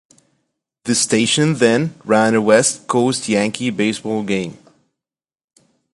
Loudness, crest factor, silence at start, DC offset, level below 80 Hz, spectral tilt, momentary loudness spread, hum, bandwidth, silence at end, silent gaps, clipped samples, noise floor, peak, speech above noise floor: -16 LUFS; 18 dB; 0.85 s; under 0.1%; -60 dBFS; -4 dB/octave; 9 LU; none; 11.5 kHz; 1.4 s; none; under 0.1%; under -90 dBFS; 0 dBFS; over 74 dB